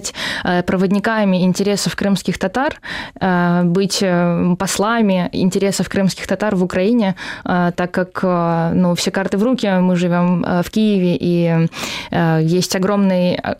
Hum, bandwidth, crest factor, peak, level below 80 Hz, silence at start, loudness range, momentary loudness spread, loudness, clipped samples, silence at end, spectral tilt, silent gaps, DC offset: none; 15.5 kHz; 12 dB; -4 dBFS; -46 dBFS; 0 s; 1 LU; 5 LU; -17 LUFS; under 0.1%; 0 s; -5.5 dB/octave; none; under 0.1%